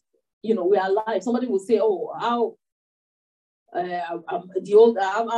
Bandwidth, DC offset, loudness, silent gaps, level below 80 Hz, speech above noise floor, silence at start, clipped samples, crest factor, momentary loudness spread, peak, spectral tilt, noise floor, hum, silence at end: 10 kHz; under 0.1%; -22 LUFS; 2.72-3.66 s; -78 dBFS; over 69 dB; 0.45 s; under 0.1%; 18 dB; 14 LU; -4 dBFS; -5.5 dB/octave; under -90 dBFS; none; 0 s